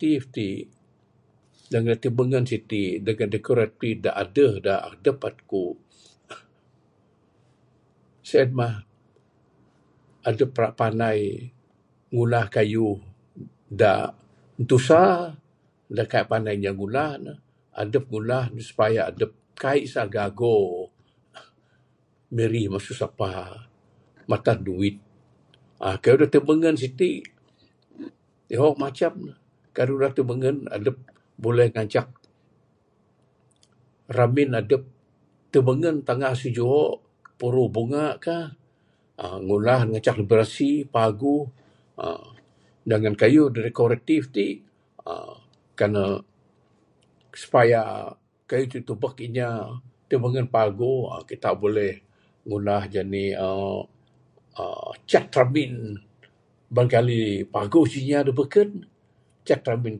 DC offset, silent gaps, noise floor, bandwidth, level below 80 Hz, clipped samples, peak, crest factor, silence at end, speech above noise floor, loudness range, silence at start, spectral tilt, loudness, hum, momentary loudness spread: under 0.1%; none; -64 dBFS; 11 kHz; -56 dBFS; under 0.1%; -2 dBFS; 22 dB; 0 s; 42 dB; 6 LU; 0 s; -7.5 dB/octave; -23 LUFS; none; 17 LU